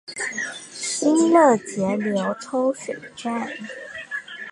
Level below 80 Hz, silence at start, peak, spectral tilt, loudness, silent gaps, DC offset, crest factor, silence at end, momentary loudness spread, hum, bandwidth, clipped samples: -68 dBFS; 0.1 s; -4 dBFS; -4 dB/octave; -22 LUFS; none; under 0.1%; 18 dB; 0 s; 16 LU; none; 11.5 kHz; under 0.1%